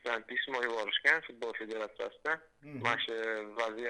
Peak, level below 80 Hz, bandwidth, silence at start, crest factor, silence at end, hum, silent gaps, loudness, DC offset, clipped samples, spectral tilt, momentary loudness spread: -12 dBFS; -76 dBFS; 11 kHz; 0.05 s; 24 dB; 0 s; none; none; -34 LUFS; under 0.1%; under 0.1%; -3.5 dB/octave; 12 LU